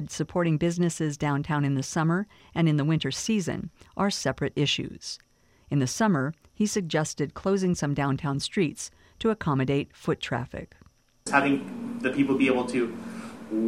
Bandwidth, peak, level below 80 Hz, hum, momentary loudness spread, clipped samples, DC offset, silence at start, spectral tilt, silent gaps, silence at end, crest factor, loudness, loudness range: 15 kHz; -6 dBFS; -56 dBFS; none; 12 LU; under 0.1%; under 0.1%; 0 s; -5.5 dB/octave; none; 0 s; 20 dB; -27 LUFS; 2 LU